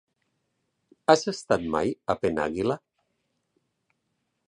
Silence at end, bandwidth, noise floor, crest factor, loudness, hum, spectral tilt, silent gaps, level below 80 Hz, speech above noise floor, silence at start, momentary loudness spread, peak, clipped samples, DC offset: 1.7 s; 11.5 kHz; -77 dBFS; 26 dB; -26 LUFS; none; -5 dB/octave; none; -58 dBFS; 53 dB; 1.1 s; 8 LU; -4 dBFS; under 0.1%; under 0.1%